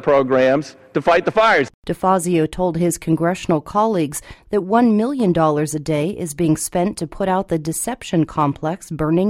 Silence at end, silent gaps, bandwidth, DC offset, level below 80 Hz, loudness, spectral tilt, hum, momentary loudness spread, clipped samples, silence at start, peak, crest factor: 0 s; 1.74-1.83 s; 16 kHz; under 0.1%; -44 dBFS; -18 LUFS; -5.5 dB/octave; none; 8 LU; under 0.1%; 0 s; -2 dBFS; 16 dB